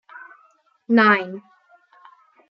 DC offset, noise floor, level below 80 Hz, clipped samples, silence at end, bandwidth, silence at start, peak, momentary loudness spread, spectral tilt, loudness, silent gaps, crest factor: under 0.1%; -59 dBFS; -78 dBFS; under 0.1%; 1.1 s; 5.8 kHz; 0.9 s; -2 dBFS; 27 LU; -7.5 dB/octave; -17 LUFS; none; 20 dB